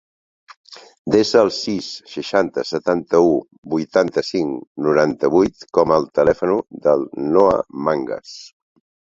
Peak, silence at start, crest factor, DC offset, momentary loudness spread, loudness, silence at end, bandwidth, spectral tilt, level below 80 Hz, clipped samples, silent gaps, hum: 0 dBFS; 0.7 s; 18 dB; under 0.1%; 10 LU; -18 LUFS; 0.55 s; 7.8 kHz; -5.5 dB/octave; -52 dBFS; under 0.1%; 0.98-1.05 s, 3.58-3.63 s, 4.67-4.75 s; none